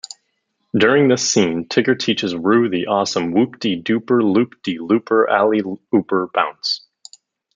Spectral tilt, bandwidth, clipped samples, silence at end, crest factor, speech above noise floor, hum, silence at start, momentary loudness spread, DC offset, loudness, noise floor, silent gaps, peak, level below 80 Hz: -4.5 dB/octave; 9.4 kHz; under 0.1%; 0.8 s; 16 dB; 53 dB; none; 0.75 s; 8 LU; under 0.1%; -17 LUFS; -70 dBFS; none; -2 dBFS; -64 dBFS